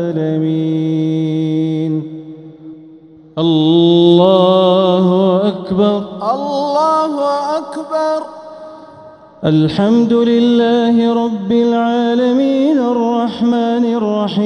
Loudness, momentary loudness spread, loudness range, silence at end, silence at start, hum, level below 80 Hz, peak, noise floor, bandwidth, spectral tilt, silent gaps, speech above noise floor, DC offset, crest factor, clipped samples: -13 LUFS; 11 LU; 6 LU; 0 s; 0 s; none; -56 dBFS; 0 dBFS; -40 dBFS; 9.8 kHz; -8 dB/octave; none; 27 dB; under 0.1%; 14 dB; under 0.1%